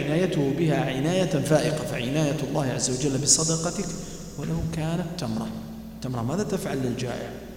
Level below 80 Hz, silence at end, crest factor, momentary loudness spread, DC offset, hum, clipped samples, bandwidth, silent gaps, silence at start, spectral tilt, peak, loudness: -46 dBFS; 0 s; 20 dB; 13 LU; under 0.1%; none; under 0.1%; 16.5 kHz; none; 0 s; -4.5 dB/octave; -4 dBFS; -25 LUFS